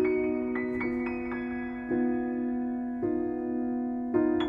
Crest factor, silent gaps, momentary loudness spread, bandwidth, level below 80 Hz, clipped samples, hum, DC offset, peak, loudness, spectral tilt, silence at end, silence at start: 16 dB; none; 6 LU; 4.6 kHz; -56 dBFS; under 0.1%; none; under 0.1%; -14 dBFS; -31 LUFS; -8.5 dB/octave; 0 s; 0 s